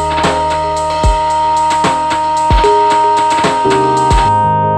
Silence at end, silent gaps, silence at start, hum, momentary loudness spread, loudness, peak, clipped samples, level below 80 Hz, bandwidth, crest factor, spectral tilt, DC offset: 0 s; none; 0 s; none; 4 LU; -11 LUFS; 0 dBFS; under 0.1%; -22 dBFS; 11.5 kHz; 10 dB; -4.5 dB/octave; under 0.1%